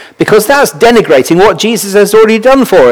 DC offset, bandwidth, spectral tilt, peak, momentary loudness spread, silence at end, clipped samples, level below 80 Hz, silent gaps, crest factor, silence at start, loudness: under 0.1%; over 20 kHz; -4 dB/octave; 0 dBFS; 3 LU; 0 s; 8%; -36 dBFS; none; 6 dB; 0 s; -6 LUFS